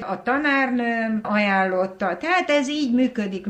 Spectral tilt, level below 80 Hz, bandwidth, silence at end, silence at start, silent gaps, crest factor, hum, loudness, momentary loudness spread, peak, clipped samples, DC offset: -5 dB/octave; -62 dBFS; 8.8 kHz; 0 s; 0 s; none; 14 dB; none; -21 LUFS; 5 LU; -8 dBFS; under 0.1%; under 0.1%